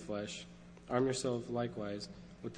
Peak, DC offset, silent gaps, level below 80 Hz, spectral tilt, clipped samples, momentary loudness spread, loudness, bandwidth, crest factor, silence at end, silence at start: -18 dBFS; under 0.1%; none; -64 dBFS; -5 dB/octave; under 0.1%; 15 LU; -38 LUFS; 10.5 kHz; 22 dB; 0 s; 0 s